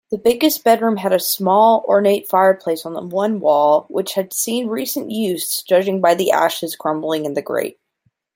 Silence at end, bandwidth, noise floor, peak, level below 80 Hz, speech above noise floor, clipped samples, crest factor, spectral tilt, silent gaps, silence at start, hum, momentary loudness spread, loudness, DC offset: 0.65 s; 17 kHz; -66 dBFS; 0 dBFS; -62 dBFS; 49 dB; under 0.1%; 16 dB; -4 dB/octave; none; 0.1 s; none; 9 LU; -17 LUFS; under 0.1%